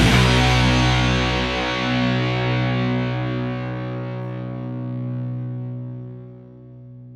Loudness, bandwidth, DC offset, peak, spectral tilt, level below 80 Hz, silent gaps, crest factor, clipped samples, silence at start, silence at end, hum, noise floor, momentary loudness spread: -21 LUFS; 13.5 kHz; under 0.1%; -2 dBFS; -5.5 dB/octave; -32 dBFS; none; 18 dB; under 0.1%; 0 s; 0 s; none; -41 dBFS; 17 LU